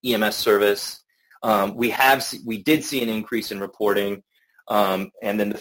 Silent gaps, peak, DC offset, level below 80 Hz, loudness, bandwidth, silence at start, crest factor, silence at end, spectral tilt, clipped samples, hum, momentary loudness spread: none; -2 dBFS; under 0.1%; -62 dBFS; -22 LUFS; 17 kHz; 0.05 s; 20 dB; 0 s; -4 dB/octave; under 0.1%; none; 11 LU